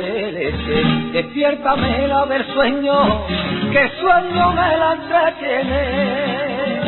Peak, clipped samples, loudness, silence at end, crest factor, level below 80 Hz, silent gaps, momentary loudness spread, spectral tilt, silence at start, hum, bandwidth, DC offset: -2 dBFS; under 0.1%; -17 LUFS; 0 s; 14 dB; -34 dBFS; none; 6 LU; -11 dB/octave; 0 s; none; 4.3 kHz; under 0.1%